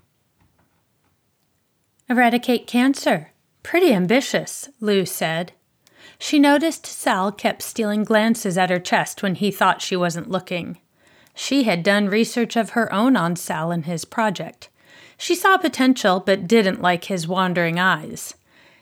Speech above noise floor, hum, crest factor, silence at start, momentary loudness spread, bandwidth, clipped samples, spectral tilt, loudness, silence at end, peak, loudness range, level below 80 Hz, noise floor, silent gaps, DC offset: 48 dB; none; 18 dB; 2.1 s; 10 LU; 19 kHz; under 0.1%; -4.5 dB/octave; -20 LUFS; 0.5 s; -4 dBFS; 3 LU; -70 dBFS; -67 dBFS; none; under 0.1%